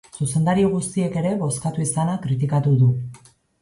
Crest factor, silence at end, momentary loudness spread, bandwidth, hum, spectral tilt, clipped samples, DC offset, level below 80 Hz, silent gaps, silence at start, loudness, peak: 14 dB; 0.45 s; 6 LU; 11.5 kHz; none; -6.5 dB/octave; under 0.1%; under 0.1%; -52 dBFS; none; 0.15 s; -21 LUFS; -8 dBFS